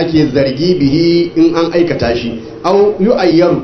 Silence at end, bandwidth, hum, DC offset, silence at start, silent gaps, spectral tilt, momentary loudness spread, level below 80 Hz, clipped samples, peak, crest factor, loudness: 0 s; 6.4 kHz; none; under 0.1%; 0 s; none; -7.5 dB/octave; 6 LU; -38 dBFS; under 0.1%; 0 dBFS; 10 dB; -11 LUFS